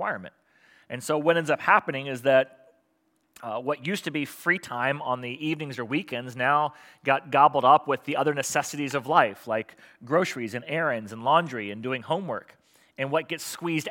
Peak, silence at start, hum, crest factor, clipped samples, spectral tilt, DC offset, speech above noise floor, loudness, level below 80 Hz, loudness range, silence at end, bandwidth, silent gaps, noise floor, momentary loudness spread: -4 dBFS; 0 s; none; 22 dB; under 0.1%; -4.5 dB/octave; under 0.1%; 45 dB; -26 LUFS; -80 dBFS; 5 LU; 0 s; 17 kHz; none; -71 dBFS; 12 LU